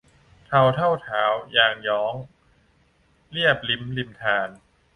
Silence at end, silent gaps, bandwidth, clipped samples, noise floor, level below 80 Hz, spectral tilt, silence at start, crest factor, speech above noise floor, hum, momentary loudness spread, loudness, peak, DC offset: 0.4 s; none; 10.5 kHz; under 0.1%; -62 dBFS; -58 dBFS; -6 dB/octave; 0.5 s; 22 dB; 39 dB; none; 11 LU; -22 LUFS; -2 dBFS; under 0.1%